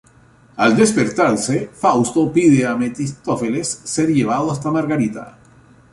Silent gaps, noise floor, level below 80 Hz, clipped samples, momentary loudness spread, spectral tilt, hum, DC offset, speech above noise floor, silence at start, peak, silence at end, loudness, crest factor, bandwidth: none; -49 dBFS; -52 dBFS; under 0.1%; 9 LU; -5.5 dB/octave; none; under 0.1%; 33 dB; 0.55 s; -2 dBFS; 0.65 s; -17 LUFS; 16 dB; 11.5 kHz